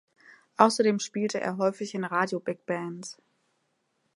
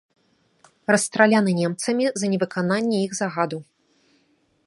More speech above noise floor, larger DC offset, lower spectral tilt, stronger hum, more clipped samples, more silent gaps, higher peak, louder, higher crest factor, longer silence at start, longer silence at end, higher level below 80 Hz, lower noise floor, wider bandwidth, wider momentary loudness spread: first, 48 dB vs 43 dB; neither; about the same, -4.5 dB/octave vs -5 dB/octave; neither; neither; neither; about the same, -2 dBFS vs -2 dBFS; second, -27 LUFS vs -22 LUFS; about the same, 26 dB vs 22 dB; second, 0.6 s vs 0.9 s; about the same, 1.05 s vs 1.05 s; second, -82 dBFS vs -70 dBFS; first, -75 dBFS vs -65 dBFS; about the same, 11.5 kHz vs 11.5 kHz; first, 16 LU vs 9 LU